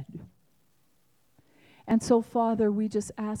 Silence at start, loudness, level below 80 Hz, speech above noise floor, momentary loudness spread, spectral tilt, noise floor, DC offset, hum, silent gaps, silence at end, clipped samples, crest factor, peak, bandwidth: 0 s; -27 LUFS; -62 dBFS; 44 dB; 21 LU; -6.5 dB/octave; -70 dBFS; under 0.1%; none; none; 0 s; under 0.1%; 18 dB; -12 dBFS; 12 kHz